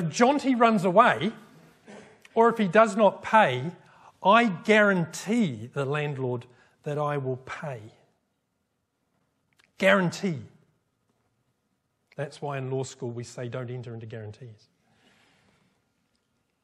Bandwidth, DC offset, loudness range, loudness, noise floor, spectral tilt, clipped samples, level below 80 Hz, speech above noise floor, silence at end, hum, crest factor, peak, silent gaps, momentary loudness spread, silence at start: 13.5 kHz; under 0.1%; 14 LU; -24 LUFS; -77 dBFS; -5.5 dB/octave; under 0.1%; -74 dBFS; 52 dB; 2.1 s; none; 22 dB; -4 dBFS; none; 18 LU; 0 s